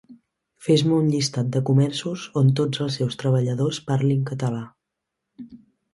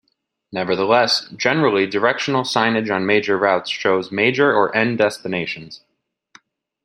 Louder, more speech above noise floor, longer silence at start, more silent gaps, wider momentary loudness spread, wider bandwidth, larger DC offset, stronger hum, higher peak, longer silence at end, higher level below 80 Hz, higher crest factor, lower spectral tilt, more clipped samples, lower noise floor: second, -22 LUFS vs -18 LUFS; first, 61 dB vs 53 dB; second, 0.1 s vs 0.5 s; neither; about the same, 11 LU vs 9 LU; second, 11.5 kHz vs 13 kHz; neither; neither; second, -6 dBFS vs 0 dBFS; second, 0.35 s vs 1.1 s; first, -60 dBFS vs -66 dBFS; about the same, 16 dB vs 18 dB; first, -6.5 dB/octave vs -4.5 dB/octave; neither; first, -82 dBFS vs -71 dBFS